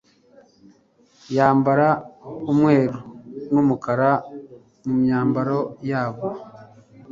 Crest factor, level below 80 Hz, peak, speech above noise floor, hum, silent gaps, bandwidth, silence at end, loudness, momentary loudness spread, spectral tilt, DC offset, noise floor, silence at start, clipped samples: 20 dB; -60 dBFS; -2 dBFS; 38 dB; none; none; 7.4 kHz; 0 s; -20 LUFS; 19 LU; -9 dB/octave; under 0.1%; -57 dBFS; 1.3 s; under 0.1%